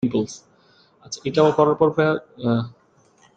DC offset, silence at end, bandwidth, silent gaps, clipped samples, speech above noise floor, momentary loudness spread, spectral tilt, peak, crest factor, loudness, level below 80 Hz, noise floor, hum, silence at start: under 0.1%; 0.7 s; 8.4 kHz; none; under 0.1%; 37 dB; 17 LU; -6.5 dB/octave; -2 dBFS; 20 dB; -21 LUFS; -60 dBFS; -57 dBFS; none; 0.05 s